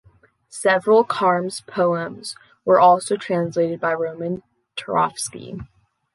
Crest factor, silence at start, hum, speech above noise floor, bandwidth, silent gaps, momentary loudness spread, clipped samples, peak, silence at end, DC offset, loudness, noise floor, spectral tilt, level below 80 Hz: 18 dB; 0.55 s; none; 35 dB; 11.5 kHz; none; 19 LU; under 0.1%; -4 dBFS; 0.5 s; under 0.1%; -20 LUFS; -55 dBFS; -4.5 dB/octave; -60 dBFS